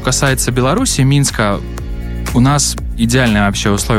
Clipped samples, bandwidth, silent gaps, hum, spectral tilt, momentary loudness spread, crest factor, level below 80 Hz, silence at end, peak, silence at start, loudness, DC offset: under 0.1%; 16.5 kHz; none; none; -4.5 dB/octave; 11 LU; 12 dB; -24 dBFS; 0 s; -2 dBFS; 0 s; -13 LUFS; under 0.1%